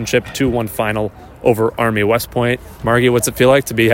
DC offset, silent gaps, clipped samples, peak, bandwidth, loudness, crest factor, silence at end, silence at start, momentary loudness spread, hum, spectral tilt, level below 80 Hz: under 0.1%; none; under 0.1%; 0 dBFS; 16.5 kHz; -16 LUFS; 14 dB; 0 s; 0 s; 6 LU; none; -5 dB/octave; -40 dBFS